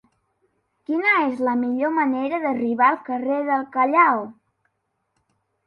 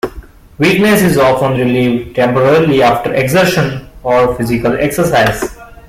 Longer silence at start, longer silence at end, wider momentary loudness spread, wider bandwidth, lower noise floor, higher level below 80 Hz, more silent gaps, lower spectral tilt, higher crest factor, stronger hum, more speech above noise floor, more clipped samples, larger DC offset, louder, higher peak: first, 0.9 s vs 0.05 s; first, 1.35 s vs 0.15 s; first, 9 LU vs 6 LU; second, 5.6 kHz vs 16.5 kHz; first, -74 dBFS vs -32 dBFS; second, -72 dBFS vs -36 dBFS; neither; first, -7 dB/octave vs -5.5 dB/octave; first, 18 dB vs 12 dB; neither; first, 53 dB vs 22 dB; neither; neither; second, -21 LUFS vs -11 LUFS; second, -4 dBFS vs 0 dBFS